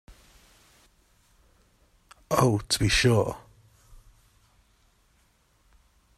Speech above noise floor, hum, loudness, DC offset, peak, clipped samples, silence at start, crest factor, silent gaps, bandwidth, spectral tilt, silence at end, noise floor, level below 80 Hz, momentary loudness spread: 42 dB; none; -24 LUFS; under 0.1%; -6 dBFS; under 0.1%; 0.1 s; 26 dB; none; 15 kHz; -4.5 dB/octave; 2.8 s; -65 dBFS; -46 dBFS; 10 LU